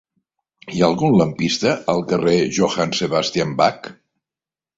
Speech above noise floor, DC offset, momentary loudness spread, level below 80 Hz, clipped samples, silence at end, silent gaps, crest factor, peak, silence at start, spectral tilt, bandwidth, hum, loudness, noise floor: over 72 dB; under 0.1%; 5 LU; -54 dBFS; under 0.1%; 0.85 s; none; 18 dB; -2 dBFS; 0.65 s; -5 dB/octave; 8 kHz; none; -18 LUFS; under -90 dBFS